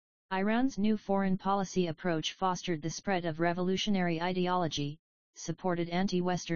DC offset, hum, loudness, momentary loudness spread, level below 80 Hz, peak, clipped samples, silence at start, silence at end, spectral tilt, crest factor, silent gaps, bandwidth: 0.5%; none; -32 LUFS; 6 LU; -60 dBFS; -14 dBFS; under 0.1%; 0.3 s; 0 s; -5.5 dB/octave; 16 dB; 4.99-5.33 s; 7.2 kHz